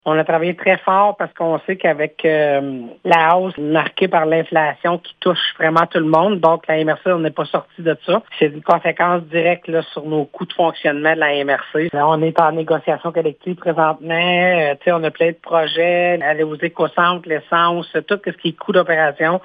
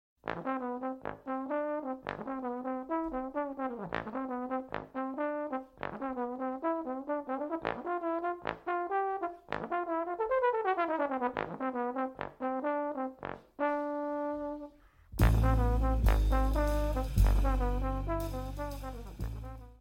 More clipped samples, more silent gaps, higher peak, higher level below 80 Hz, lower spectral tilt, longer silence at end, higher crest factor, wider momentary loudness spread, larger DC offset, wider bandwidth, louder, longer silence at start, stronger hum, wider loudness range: neither; neither; first, 0 dBFS vs -12 dBFS; second, -68 dBFS vs -36 dBFS; about the same, -7.5 dB/octave vs -7.5 dB/octave; about the same, 0.05 s vs 0.05 s; about the same, 16 dB vs 20 dB; second, 7 LU vs 11 LU; neither; second, 6 kHz vs 16.5 kHz; first, -17 LUFS vs -34 LUFS; second, 0.05 s vs 0.25 s; neither; second, 2 LU vs 6 LU